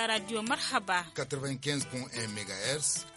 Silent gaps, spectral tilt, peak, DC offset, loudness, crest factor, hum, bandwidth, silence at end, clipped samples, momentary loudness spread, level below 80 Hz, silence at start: none; -2.5 dB/octave; -14 dBFS; under 0.1%; -32 LUFS; 20 dB; none; 11.5 kHz; 0 s; under 0.1%; 7 LU; -68 dBFS; 0 s